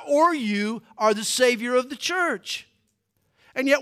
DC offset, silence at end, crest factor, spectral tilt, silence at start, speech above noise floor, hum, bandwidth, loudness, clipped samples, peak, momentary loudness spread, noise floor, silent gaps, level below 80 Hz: under 0.1%; 0 s; 18 dB; -3 dB/octave; 0 s; 49 dB; none; 16 kHz; -23 LUFS; under 0.1%; -6 dBFS; 10 LU; -71 dBFS; none; -76 dBFS